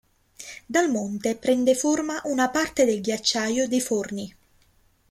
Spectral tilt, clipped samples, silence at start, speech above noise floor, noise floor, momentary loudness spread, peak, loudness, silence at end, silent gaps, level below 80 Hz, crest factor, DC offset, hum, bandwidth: -3 dB/octave; under 0.1%; 0.4 s; 38 dB; -62 dBFS; 14 LU; -8 dBFS; -24 LUFS; 0.8 s; none; -60 dBFS; 18 dB; under 0.1%; none; 15.5 kHz